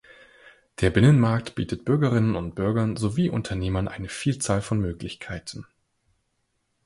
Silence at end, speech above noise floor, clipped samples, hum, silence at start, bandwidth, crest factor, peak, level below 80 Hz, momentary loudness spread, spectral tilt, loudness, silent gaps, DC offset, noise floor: 1.25 s; 50 dB; under 0.1%; none; 0.45 s; 11.5 kHz; 20 dB; -4 dBFS; -44 dBFS; 16 LU; -6.5 dB/octave; -24 LUFS; none; under 0.1%; -74 dBFS